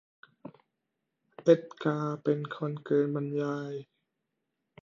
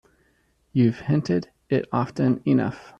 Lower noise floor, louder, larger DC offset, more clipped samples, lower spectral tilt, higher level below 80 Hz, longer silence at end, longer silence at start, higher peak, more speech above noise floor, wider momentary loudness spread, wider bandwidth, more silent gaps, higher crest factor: first, -84 dBFS vs -65 dBFS; second, -30 LUFS vs -24 LUFS; neither; neither; about the same, -8 dB/octave vs -8.5 dB/octave; second, -80 dBFS vs -58 dBFS; first, 1 s vs 0.1 s; second, 0.45 s vs 0.75 s; about the same, -10 dBFS vs -8 dBFS; first, 55 dB vs 43 dB; first, 25 LU vs 5 LU; second, 7.2 kHz vs 8.2 kHz; neither; first, 22 dB vs 16 dB